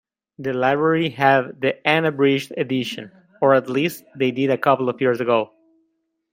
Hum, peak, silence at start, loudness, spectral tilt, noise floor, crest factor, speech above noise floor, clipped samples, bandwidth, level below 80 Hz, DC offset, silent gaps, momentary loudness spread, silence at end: none; -2 dBFS; 0.4 s; -20 LUFS; -6 dB/octave; -71 dBFS; 18 dB; 51 dB; under 0.1%; 16 kHz; -66 dBFS; under 0.1%; none; 8 LU; 0.85 s